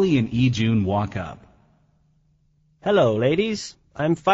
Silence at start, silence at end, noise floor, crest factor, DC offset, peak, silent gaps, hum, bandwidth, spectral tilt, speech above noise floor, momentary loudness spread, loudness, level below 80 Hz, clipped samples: 0 s; 0 s; -62 dBFS; 18 dB; under 0.1%; -6 dBFS; none; none; 8 kHz; -6 dB/octave; 42 dB; 12 LU; -22 LUFS; -50 dBFS; under 0.1%